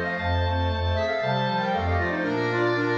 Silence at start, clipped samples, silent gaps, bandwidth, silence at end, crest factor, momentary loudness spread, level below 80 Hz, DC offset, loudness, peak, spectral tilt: 0 s; under 0.1%; none; 7.2 kHz; 0 s; 12 dB; 2 LU; -40 dBFS; under 0.1%; -25 LUFS; -12 dBFS; -7 dB/octave